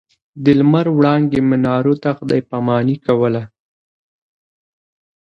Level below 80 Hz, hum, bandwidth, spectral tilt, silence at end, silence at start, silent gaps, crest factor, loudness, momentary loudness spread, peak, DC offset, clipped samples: -54 dBFS; none; 6.2 kHz; -9.5 dB/octave; 1.75 s; 0.35 s; none; 16 dB; -15 LUFS; 6 LU; 0 dBFS; under 0.1%; under 0.1%